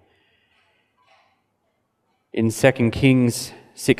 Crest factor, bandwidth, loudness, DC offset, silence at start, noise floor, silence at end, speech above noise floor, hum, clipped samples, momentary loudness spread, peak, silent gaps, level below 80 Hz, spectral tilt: 22 dB; 15.5 kHz; -20 LUFS; under 0.1%; 2.35 s; -71 dBFS; 0.05 s; 52 dB; none; under 0.1%; 14 LU; -2 dBFS; none; -50 dBFS; -5.5 dB/octave